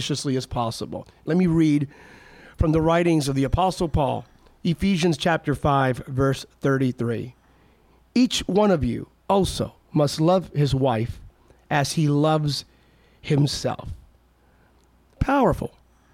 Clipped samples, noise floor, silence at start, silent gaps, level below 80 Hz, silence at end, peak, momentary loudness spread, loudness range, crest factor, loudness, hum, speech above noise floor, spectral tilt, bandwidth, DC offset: under 0.1%; -58 dBFS; 0 s; none; -40 dBFS; 0.45 s; -8 dBFS; 12 LU; 3 LU; 16 dB; -23 LUFS; none; 36 dB; -6 dB/octave; 15.5 kHz; under 0.1%